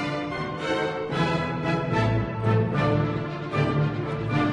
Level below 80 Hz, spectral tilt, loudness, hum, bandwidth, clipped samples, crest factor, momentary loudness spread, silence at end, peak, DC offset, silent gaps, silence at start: -46 dBFS; -7.5 dB/octave; -26 LUFS; none; 10.5 kHz; under 0.1%; 14 dB; 6 LU; 0 s; -10 dBFS; under 0.1%; none; 0 s